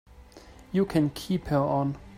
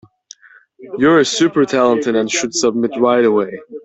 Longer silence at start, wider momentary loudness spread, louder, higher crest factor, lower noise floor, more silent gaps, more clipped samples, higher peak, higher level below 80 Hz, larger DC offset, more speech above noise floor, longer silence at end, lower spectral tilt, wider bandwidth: second, 0.2 s vs 0.8 s; about the same, 5 LU vs 5 LU; second, -27 LUFS vs -15 LUFS; about the same, 16 dB vs 14 dB; first, -50 dBFS vs -46 dBFS; neither; neither; second, -12 dBFS vs -2 dBFS; first, -50 dBFS vs -58 dBFS; neither; second, 24 dB vs 31 dB; about the same, 0 s vs 0.05 s; first, -7.5 dB/octave vs -4 dB/octave; first, 16 kHz vs 8.2 kHz